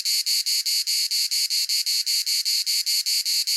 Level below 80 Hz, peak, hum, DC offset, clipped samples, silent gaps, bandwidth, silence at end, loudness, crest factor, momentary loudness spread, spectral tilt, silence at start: under -90 dBFS; -8 dBFS; none; under 0.1%; under 0.1%; none; 17 kHz; 0 s; -20 LUFS; 14 dB; 0 LU; 14.5 dB/octave; 0 s